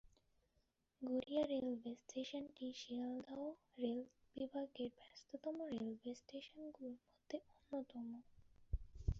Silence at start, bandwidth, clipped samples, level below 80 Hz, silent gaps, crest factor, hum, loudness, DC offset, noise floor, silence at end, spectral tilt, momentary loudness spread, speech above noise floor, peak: 0.05 s; 7.6 kHz; under 0.1%; -58 dBFS; none; 20 dB; none; -48 LUFS; under 0.1%; -83 dBFS; 0 s; -6 dB/octave; 12 LU; 36 dB; -26 dBFS